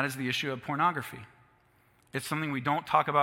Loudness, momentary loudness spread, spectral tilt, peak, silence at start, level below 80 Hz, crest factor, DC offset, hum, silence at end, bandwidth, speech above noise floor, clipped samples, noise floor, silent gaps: -30 LUFS; 12 LU; -4.5 dB/octave; -8 dBFS; 0 s; -72 dBFS; 22 dB; under 0.1%; none; 0 s; 16.5 kHz; 35 dB; under 0.1%; -65 dBFS; none